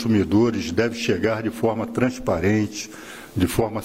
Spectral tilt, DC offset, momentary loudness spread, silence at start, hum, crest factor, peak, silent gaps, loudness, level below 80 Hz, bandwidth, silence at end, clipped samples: -6 dB/octave; 0.1%; 11 LU; 0 s; none; 16 dB; -6 dBFS; none; -22 LUFS; -44 dBFS; 16 kHz; 0 s; under 0.1%